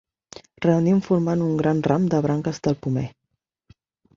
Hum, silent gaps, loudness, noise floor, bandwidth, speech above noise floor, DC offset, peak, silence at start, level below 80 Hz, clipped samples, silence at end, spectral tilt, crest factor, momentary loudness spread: none; none; -22 LUFS; -78 dBFS; 7.4 kHz; 58 dB; under 0.1%; -4 dBFS; 0.6 s; -56 dBFS; under 0.1%; 1.1 s; -8 dB/octave; 18 dB; 6 LU